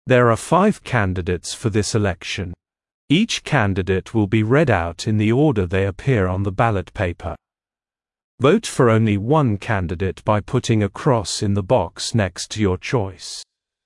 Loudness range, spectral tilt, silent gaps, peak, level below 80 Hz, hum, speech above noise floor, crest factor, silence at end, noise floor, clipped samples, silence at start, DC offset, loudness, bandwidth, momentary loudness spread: 3 LU; -6 dB/octave; 2.94-3.08 s, 8.24-8.38 s; -2 dBFS; -48 dBFS; none; over 71 dB; 16 dB; 0.4 s; under -90 dBFS; under 0.1%; 0.05 s; under 0.1%; -19 LUFS; 12 kHz; 8 LU